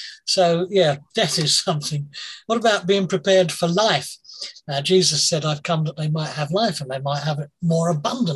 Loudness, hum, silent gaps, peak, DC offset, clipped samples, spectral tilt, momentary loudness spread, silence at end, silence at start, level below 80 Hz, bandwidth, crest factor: -20 LUFS; none; none; -4 dBFS; under 0.1%; under 0.1%; -4 dB/octave; 10 LU; 0 s; 0 s; -62 dBFS; 12.5 kHz; 16 dB